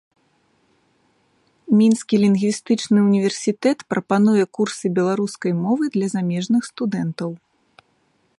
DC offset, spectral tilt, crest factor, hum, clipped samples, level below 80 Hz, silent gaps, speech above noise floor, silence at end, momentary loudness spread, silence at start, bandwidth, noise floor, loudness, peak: under 0.1%; -6 dB/octave; 16 dB; none; under 0.1%; -68 dBFS; none; 45 dB; 1 s; 8 LU; 1.7 s; 11.5 kHz; -64 dBFS; -20 LUFS; -4 dBFS